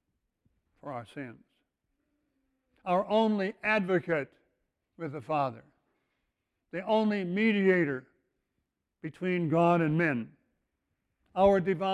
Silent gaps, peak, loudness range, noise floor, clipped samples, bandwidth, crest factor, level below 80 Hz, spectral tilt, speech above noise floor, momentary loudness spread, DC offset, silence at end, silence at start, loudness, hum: none; -12 dBFS; 5 LU; -83 dBFS; under 0.1%; 10 kHz; 20 dB; -64 dBFS; -8 dB/octave; 54 dB; 18 LU; under 0.1%; 0 s; 0.85 s; -28 LUFS; none